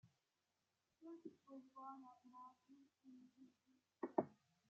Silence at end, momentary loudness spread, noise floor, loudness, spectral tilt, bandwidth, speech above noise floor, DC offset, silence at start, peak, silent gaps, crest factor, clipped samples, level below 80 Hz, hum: 0.35 s; 21 LU; -90 dBFS; -53 LUFS; -7.5 dB/octave; 7.2 kHz; 36 dB; under 0.1%; 0.05 s; -22 dBFS; none; 32 dB; under 0.1%; under -90 dBFS; none